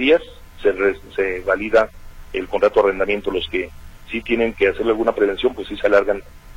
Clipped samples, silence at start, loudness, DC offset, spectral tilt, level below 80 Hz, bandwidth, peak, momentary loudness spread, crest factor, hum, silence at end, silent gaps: under 0.1%; 0 s; -20 LUFS; under 0.1%; -5.5 dB/octave; -40 dBFS; 16 kHz; -4 dBFS; 10 LU; 16 dB; none; 0 s; none